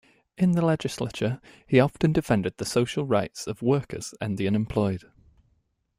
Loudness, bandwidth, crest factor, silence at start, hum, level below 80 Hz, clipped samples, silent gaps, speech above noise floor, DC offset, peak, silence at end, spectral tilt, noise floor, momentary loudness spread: -26 LUFS; 15.5 kHz; 20 dB; 0.4 s; none; -54 dBFS; under 0.1%; none; 45 dB; under 0.1%; -6 dBFS; 1 s; -6.5 dB/octave; -70 dBFS; 10 LU